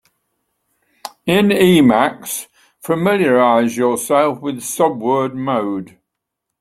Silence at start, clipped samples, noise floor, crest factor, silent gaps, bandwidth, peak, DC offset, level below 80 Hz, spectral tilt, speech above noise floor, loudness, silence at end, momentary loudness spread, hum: 1.05 s; under 0.1%; -78 dBFS; 16 dB; none; 16.5 kHz; 0 dBFS; under 0.1%; -56 dBFS; -5 dB/octave; 63 dB; -16 LUFS; 0.75 s; 14 LU; none